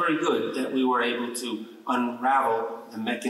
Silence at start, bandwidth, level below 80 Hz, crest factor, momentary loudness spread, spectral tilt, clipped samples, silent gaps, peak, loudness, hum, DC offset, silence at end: 0 s; 14 kHz; -80 dBFS; 14 dB; 10 LU; -3.5 dB/octave; under 0.1%; none; -12 dBFS; -26 LUFS; none; under 0.1%; 0 s